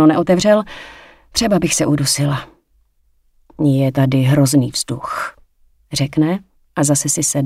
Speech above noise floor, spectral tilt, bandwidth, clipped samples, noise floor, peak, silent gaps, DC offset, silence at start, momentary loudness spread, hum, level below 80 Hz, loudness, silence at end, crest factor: 43 dB; -5 dB/octave; 16 kHz; under 0.1%; -58 dBFS; 0 dBFS; none; under 0.1%; 0 s; 12 LU; none; -46 dBFS; -16 LUFS; 0 s; 16 dB